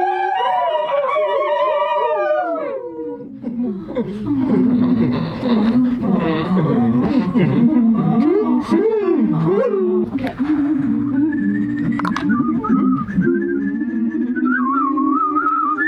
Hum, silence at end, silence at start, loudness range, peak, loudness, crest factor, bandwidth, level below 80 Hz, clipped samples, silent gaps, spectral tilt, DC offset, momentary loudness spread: none; 0 s; 0 s; 4 LU; -4 dBFS; -18 LUFS; 12 dB; 6.4 kHz; -48 dBFS; under 0.1%; none; -9 dB/octave; under 0.1%; 7 LU